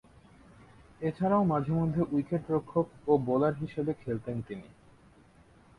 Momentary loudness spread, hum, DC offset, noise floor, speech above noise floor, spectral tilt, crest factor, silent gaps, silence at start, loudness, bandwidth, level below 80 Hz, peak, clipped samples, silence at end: 10 LU; none; under 0.1%; -59 dBFS; 29 dB; -10 dB/octave; 20 dB; none; 1 s; -30 LUFS; 10.5 kHz; -60 dBFS; -12 dBFS; under 0.1%; 1.15 s